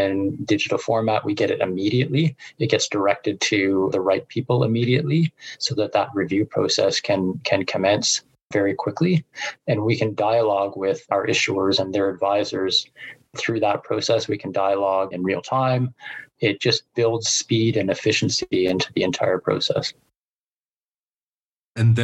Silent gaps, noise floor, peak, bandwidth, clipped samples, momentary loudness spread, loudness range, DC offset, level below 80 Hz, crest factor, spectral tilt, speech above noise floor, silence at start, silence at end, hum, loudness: 8.42-8.50 s, 20.16-20.66 s, 20.73-21.75 s; under -90 dBFS; -4 dBFS; 9.8 kHz; under 0.1%; 6 LU; 2 LU; under 0.1%; -62 dBFS; 18 dB; -4.5 dB/octave; over 69 dB; 0 s; 0 s; none; -21 LUFS